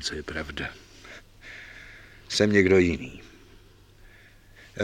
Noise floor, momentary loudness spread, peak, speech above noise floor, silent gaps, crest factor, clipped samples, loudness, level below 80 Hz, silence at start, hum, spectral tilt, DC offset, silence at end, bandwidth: -53 dBFS; 26 LU; -6 dBFS; 29 dB; none; 22 dB; under 0.1%; -24 LUFS; -50 dBFS; 0 s; none; -5 dB/octave; under 0.1%; 0 s; 13 kHz